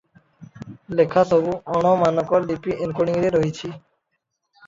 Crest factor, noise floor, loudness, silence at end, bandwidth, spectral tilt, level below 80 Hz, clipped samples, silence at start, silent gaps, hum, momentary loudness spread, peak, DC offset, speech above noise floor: 18 dB; -75 dBFS; -20 LUFS; 0.9 s; 7.8 kHz; -7 dB/octave; -54 dBFS; under 0.1%; 0.4 s; none; none; 17 LU; -4 dBFS; under 0.1%; 56 dB